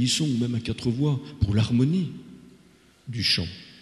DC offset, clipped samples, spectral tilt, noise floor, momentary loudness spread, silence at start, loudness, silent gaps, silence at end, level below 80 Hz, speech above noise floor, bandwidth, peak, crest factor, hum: under 0.1%; under 0.1%; -5 dB/octave; -56 dBFS; 13 LU; 0 s; -25 LUFS; none; 0.1 s; -44 dBFS; 32 dB; 12.5 kHz; -10 dBFS; 16 dB; none